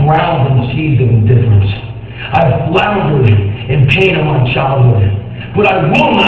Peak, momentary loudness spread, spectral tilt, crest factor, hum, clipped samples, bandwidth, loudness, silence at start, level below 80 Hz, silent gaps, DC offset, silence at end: 0 dBFS; 7 LU; -8.5 dB/octave; 10 dB; none; 0.2%; 6.2 kHz; -11 LUFS; 0 s; -28 dBFS; none; 0.7%; 0 s